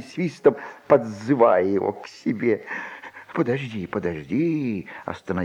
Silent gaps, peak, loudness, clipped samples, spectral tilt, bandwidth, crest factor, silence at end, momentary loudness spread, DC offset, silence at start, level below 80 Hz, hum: none; -4 dBFS; -23 LUFS; under 0.1%; -7.5 dB/octave; 10 kHz; 20 dB; 0 s; 14 LU; under 0.1%; 0 s; -60 dBFS; none